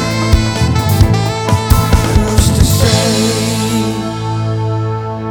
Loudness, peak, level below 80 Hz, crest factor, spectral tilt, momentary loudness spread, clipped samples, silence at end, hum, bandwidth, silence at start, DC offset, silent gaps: -13 LUFS; 0 dBFS; -20 dBFS; 12 dB; -5 dB/octave; 7 LU; 0.9%; 0 s; none; over 20 kHz; 0 s; under 0.1%; none